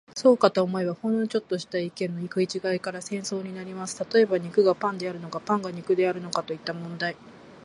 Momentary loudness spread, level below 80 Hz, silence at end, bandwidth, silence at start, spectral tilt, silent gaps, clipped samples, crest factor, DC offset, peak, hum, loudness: 11 LU; -72 dBFS; 0 s; 11.5 kHz; 0.15 s; -5 dB/octave; none; under 0.1%; 22 dB; under 0.1%; -4 dBFS; none; -26 LUFS